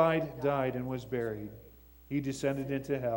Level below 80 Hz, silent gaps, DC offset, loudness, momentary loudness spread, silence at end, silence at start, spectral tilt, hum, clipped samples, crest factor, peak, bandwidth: -58 dBFS; none; under 0.1%; -34 LUFS; 9 LU; 0 s; 0 s; -7 dB/octave; none; under 0.1%; 20 dB; -12 dBFS; 16.5 kHz